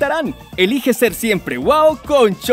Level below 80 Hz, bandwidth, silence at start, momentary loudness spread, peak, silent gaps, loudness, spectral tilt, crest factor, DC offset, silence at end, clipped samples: -42 dBFS; 16.5 kHz; 0 s; 5 LU; 0 dBFS; none; -16 LUFS; -4.5 dB/octave; 14 dB; under 0.1%; 0 s; under 0.1%